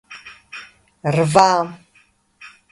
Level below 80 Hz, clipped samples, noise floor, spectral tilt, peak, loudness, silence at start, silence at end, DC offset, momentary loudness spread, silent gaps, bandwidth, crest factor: -56 dBFS; under 0.1%; -57 dBFS; -5 dB/octave; 0 dBFS; -17 LUFS; 0.1 s; 0.25 s; under 0.1%; 23 LU; none; 11.5 kHz; 20 dB